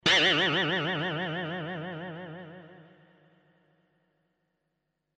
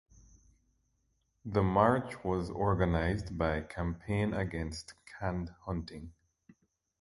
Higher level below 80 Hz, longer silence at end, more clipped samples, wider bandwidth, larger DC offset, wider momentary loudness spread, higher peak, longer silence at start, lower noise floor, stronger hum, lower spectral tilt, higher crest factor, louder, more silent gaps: second, -68 dBFS vs -46 dBFS; first, 2.35 s vs 0.9 s; neither; about the same, 11 kHz vs 11.5 kHz; neither; first, 23 LU vs 17 LU; about the same, -10 dBFS vs -10 dBFS; second, 0.05 s vs 1.45 s; first, -81 dBFS vs -77 dBFS; neither; second, -3.5 dB/octave vs -7.5 dB/octave; about the same, 22 dB vs 24 dB; first, -27 LUFS vs -33 LUFS; neither